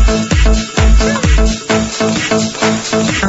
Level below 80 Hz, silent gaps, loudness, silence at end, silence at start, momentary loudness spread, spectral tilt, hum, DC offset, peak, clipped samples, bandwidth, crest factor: -14 dBFS; none; -13 LUFS; 0 s; 0 s; 3 LU; -4.5 dB/octave; none; under 0.1%; 0 dBFS; under 0.1%; 8 kHz; 12 dB